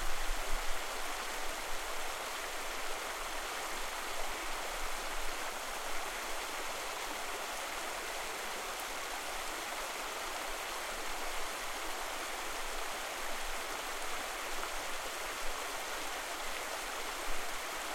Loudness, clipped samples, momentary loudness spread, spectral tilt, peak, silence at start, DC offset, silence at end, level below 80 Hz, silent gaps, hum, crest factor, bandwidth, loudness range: -39 LUFS; under 0.1%; 0 LU; -0.5 dB/octave; -20 dBFS; 0 s; under 0.1%; 0 s; -48 dBFS; none; none; 18 dB; 16.5 kHz; 0 LU